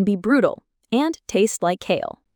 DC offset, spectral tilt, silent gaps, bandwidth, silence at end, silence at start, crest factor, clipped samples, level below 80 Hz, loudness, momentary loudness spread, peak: under 0.1%; -5 dB/octave; none; 19 kHz; 0.25 s; 0 s; 16 dB; under 0.1%; -58 dBFS; -21 LUFS; 6 LU; -4 dBFS